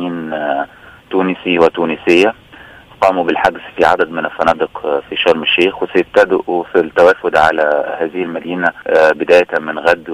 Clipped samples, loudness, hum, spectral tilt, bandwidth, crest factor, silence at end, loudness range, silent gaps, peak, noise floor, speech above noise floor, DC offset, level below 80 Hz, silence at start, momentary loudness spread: under 0.1%; -14 LUFS; none; -5 dB/octave; 12 kHz; 14 dB; 0 s; 2 LU; none; 0 dBFS; -39 dBFS; 25 dB; under 0.1%; -50 dBFS; 0 s; 8 LU